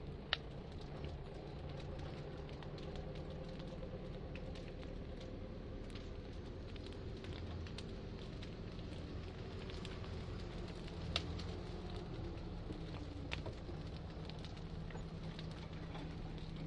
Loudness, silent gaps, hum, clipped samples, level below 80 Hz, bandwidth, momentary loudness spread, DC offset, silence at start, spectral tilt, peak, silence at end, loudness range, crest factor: -48 LUFS; none; none; under 0.1%; -52 dBFS; 11 kHz; 4 LU; under 0.1%; 0 s; -6 dB/octave; -14 dBFS; 0 s; 3 LU; 32 dB